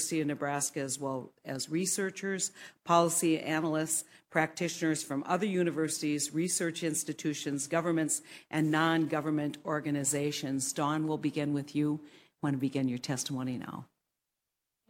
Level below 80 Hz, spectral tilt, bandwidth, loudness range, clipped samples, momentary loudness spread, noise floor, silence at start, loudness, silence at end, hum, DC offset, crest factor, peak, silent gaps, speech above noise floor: -76 dBFS; -4 dB/octave; 16.5 kHz; 3 LU; under 0.1%; 7 LU; -87 dBFS; 0 s; -32 LUFS; 1.05 s; none; under 0.1%; 22 dB; -12 dBFS; none; 55 dB